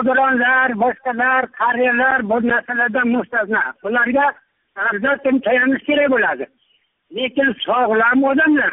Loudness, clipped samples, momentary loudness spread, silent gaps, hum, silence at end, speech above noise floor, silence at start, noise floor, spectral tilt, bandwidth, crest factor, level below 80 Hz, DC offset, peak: -16 LUFS; under 0.1%; 6 LU; none; none; 0 s; 46 dB; 0 s; -62 dBFS; 2 dB/octave; 3.9 kHz; 12 dB; -58 dBFS; under 0.1%; -4 dBFS